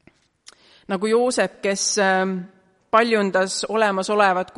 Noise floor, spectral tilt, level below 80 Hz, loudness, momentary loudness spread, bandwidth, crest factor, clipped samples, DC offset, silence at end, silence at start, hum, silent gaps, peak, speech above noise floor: -52 dBFS; -3.5 dB/octave; -66 dBFS; -20 LUFS; 7 LU; 11.5 kHz; 18 dB; under 0.1%; under 0.1%; 0.15 s; 0.9 s; none; none; -4 dBFS; 32 dB